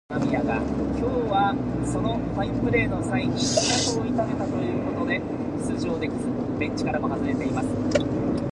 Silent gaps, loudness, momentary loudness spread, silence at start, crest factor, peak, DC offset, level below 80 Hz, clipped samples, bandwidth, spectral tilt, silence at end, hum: none; -25 LUFS; 5 LU; 0.1 s; 18 dB; -6 dBFS; under 0.1%; -42 dBFS; under 0.1%; 11.5 kHz; -5 dB/octave; 0 s; none